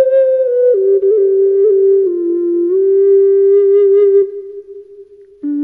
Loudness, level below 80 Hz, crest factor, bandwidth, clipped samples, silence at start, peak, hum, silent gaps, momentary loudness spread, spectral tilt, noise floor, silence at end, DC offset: -11 LUFS; -66 dBFS; 8 dB; 2.2 kHz; under 0.1%; 0 s; -2 dBFS; none; none; 11 LU; -8.5 dB/octave; -38 dBFS; 0 s; under 0.1%